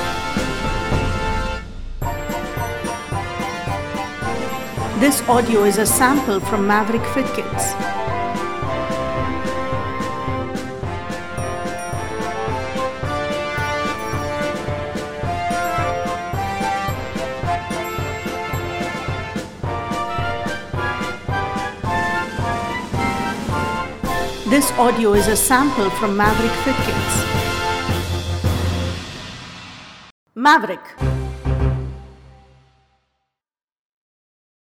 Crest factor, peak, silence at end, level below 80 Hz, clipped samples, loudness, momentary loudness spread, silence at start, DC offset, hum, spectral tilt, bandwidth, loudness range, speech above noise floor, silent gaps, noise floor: 20 dB; 0 dBFS; 0.6 s; -34 dBFS; under 0.1%; -21 LUFS; 11 LU; 0 s; under 0.1%; none; -4.5 dB/octave; 19 kHz; 8 LU; 72 dB; 30.11-30.26 s, 33.63-34.02 s; -89 dBFS